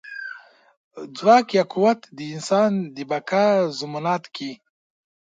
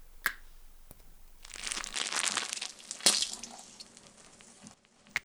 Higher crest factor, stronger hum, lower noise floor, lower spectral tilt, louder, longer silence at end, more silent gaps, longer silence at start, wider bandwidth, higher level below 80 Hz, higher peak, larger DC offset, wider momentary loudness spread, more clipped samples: second, 20 dB vs 34 dB; neither; second, -42 dBFS vs -57 dBFS; first, -5.5 dB/octave vs 1 dB/octave; first, -21 LUFS vs -31 LUFS; first, 0.75 s vs 0.05 s; first, 0.77-0.91 s vs none; about the same, 0.05 s vs 0 s; second, 9.4 kHz vs over 20 kHz; second, -74 dBFS vs -56 dBFS; about the same, -2 dBFS vs -4 dBFS; neither; second, 18 LU vs 27 LU; neither